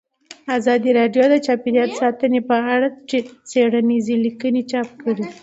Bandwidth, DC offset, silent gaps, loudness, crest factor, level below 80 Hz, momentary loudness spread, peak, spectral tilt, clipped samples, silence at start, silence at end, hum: 8 kHz; under 0.1%; none; -18 LUFS; 14 dB; -68 dBFS; 8 LU; -4 dBFS; -5.5 dB/octave; under 0.1%; 0.3 s; 0.1 s; none